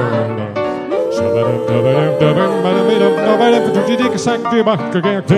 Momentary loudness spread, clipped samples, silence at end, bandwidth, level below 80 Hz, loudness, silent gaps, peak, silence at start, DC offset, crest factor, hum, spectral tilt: 6 LU; under 0.1%; 0 s; 12.5 kHz; -54 dBFS; -14 LUFS; none; 0 dBFS; 0 s; under 0.1%; 14 dB; none; -6.5 dB/octave